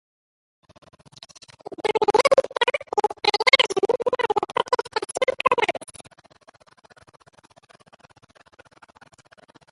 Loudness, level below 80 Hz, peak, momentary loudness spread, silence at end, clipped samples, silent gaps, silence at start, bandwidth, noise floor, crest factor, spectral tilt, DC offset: -21 LUFS; -66 dBFS; -2 dBFS; 13 LU; 3.9 s; under 0.1%; none; 1.7 s; 11.5 kHz; -54 dBFS; 24 dB; -2 dB/octave; under 0.1%